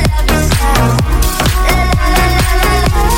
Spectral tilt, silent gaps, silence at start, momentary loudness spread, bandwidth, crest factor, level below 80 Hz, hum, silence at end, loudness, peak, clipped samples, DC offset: -4.5 dB/octave; none; 0 s; 2 LU; 17 kHz; 10 dB; -12 dBFS; none; 0 s; -12 LUFS; 0 dBFS; under 0.1%; under 0.1%